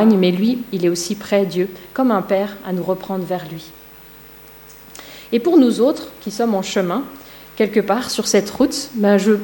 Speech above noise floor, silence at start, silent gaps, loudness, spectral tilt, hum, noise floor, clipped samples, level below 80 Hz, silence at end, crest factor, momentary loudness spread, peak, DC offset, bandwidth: 24 dB; 0 s; none; -18 LUFS; -5 dB/octave; none; -41 dBFS; under 0.1%; -54 dBFS; 0 s; 16 dB; 23 LU; -2 dBFS; under 0.1%; 16.5 kHz